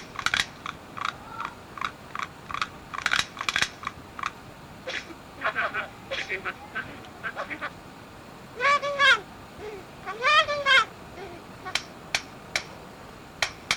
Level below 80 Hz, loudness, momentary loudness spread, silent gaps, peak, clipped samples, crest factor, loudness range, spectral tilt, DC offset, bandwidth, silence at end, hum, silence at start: -56 dBFS; -27 LUFS; 22 LU; none; -6 dBFS; under 0.1%; 22 dB; 9 LU; -1.5 dB/octave; under 0.1%; over 20 kHz; 0 s; none; 0 s